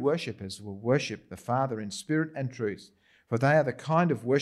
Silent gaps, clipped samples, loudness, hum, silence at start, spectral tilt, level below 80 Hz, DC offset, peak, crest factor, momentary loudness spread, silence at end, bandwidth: none; under 0.1%; -29 LUFS; none; 0 s; -6.5 dB/octave; -70 dBFS; under 0.1%; -12 dBFS; 16 dB; 13 LU; 0 s; 12.5 kHz